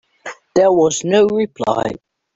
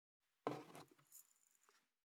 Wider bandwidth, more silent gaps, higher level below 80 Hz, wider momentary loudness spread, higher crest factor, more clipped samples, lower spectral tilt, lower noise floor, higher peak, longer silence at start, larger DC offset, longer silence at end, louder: second, 8 kHz vs 19.5 kHz; neither; first, -54 dBFS vs under -90 dBFS; first, 20 LU vs 14 LU; second, 14 dB vs 32 dB; neither; about the same, -4.5 dB/octave vs -5 dB/octave; second, -35 dBFS vs -79 dBFS; first, -2 dBFS vs -26 dBFS; second, 0.25 s vs 0.45 s; neither; about the same, 0.4 s vs 0.35 s; first, -16 LUFS vs -53 LUFS